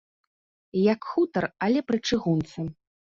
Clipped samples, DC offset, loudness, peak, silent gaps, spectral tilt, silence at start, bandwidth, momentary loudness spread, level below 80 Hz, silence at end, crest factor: under 0.1%; under 0.1%; -26 LUFS; -10 dBFS; none; -6.5 dB/octave; 0.75 s; 7.6 kHz; 10 LU; -58 dBFS; 0.45 s; 16 dB